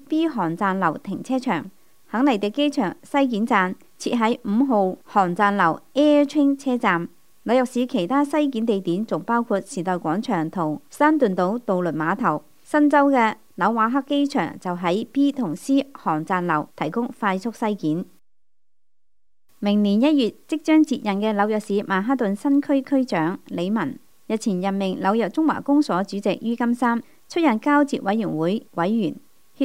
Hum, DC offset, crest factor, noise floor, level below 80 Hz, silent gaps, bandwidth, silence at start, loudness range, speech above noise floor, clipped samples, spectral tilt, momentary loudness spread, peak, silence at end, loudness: none; 0.3%; 18 dB; -84 dBFS; -72 dBFS; none; 15 kHz; 0.1 s; 3 LU; 63 dB; under 0.1%; -6 dB/octave; 8 LU; -4 dBFS; 0 s; -22 LUFS